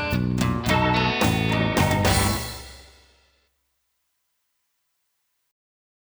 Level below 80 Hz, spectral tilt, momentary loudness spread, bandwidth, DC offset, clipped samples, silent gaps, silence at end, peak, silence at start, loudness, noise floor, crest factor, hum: -38 dBFS; -5 dB/octave; 11 LU; over 20 kHz; under 0.1%; under 0.1%; none; 3.3 s; -6 dBFS; 0 s; -22 LUFS; -74 dBFS; 18 dB; none